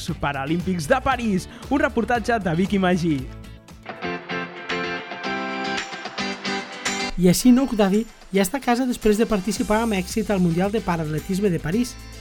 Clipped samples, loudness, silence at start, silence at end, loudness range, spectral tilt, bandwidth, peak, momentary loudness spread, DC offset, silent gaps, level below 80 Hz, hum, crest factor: under 0.1%; -22 LUFS; 0 s; 0 s; 7 LU; -5.5 dB/octave; 19 kHz; -6 dBFS; 9 LU; under 0.1%; none; -40 dBFS; none; 16 dB